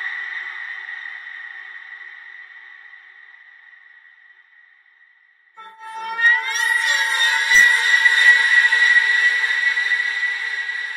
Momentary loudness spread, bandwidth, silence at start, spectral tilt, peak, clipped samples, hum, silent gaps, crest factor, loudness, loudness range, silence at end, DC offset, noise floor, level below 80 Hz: 24 LU; 16 kHz; 0 s; 3.5 dB/octave; -2 dBFS; under 0.1%; none; none; 18 dB; -14 LUFS; 21 LU; 0 s; under 0.1%; -55 dBFS; -64 dBFS